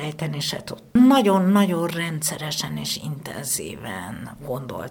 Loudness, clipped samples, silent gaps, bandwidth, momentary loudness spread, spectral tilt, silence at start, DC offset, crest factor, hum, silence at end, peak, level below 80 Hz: -22 LUFS; under 0.1%; none; 20 kHz; 16 LU; -4.5 dB/octave; 0 s; under 0.1%; 16 dB; none; 0 s; -6 dBFS; -56 dBFS